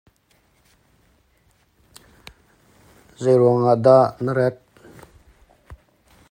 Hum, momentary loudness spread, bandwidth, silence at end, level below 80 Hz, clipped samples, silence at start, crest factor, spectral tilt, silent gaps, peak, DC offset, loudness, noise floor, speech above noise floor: none; 9 LU; 15.5 kHz; 0.55 s; -58 dBFS; under 0.1%; 3.2 s; 22 dB; -8 dB/octave; none; -2 dBFS; under 0.1%; -17 LUFS; -62 dBFS; 45 dB